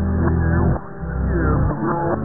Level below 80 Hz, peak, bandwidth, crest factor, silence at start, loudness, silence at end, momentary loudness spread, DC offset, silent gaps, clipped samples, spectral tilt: -26 dBFS; -4 dBFS; 2.1 kHz; 14 dB; 0 s; -20 LUFS; 0 s; 7 LU; 2%; none; under 0.1%; -16 dB/octave